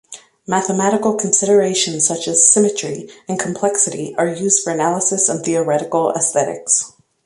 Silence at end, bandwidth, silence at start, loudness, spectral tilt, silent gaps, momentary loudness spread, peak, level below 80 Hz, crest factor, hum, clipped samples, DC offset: 0.35 s; 11.5 kHz; 0.1 s; -15 LUFS; -3 dB/octave; none; 10 LU; 0 dBFS; -62 dBFS; 18 dB; none; under 0.1%; under 0.1%